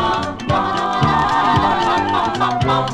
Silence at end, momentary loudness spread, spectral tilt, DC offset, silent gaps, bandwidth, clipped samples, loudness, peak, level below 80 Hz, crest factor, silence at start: 0 s; 4 LU; -5.5 dB/octave; under 0.1%; none; 12 kHz; under 0.1%; -17 LUFS; -2 dBFS; -38 dBFS; 14 dB; 0 s